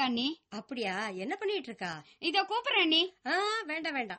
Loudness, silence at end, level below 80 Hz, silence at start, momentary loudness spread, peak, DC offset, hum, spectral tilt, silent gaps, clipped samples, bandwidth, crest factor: -31 LUFS; 0 s; -80 dBFS; 0 s; 13 LU; -16 dBFS; under 0.1%; none; -3 dB/octave; none; under 0.1%; 8.4 kHz; 18 dB